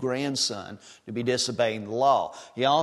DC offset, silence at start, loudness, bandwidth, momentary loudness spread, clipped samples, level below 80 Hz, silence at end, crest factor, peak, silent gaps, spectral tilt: under 0.1%; 0 s; -26 LUFS; 12.5 kHz; 14 LU; under 0.1%; -70 dBFS; 0 s; 18 dB; -8 dBFS; none; -3.5 dB/octave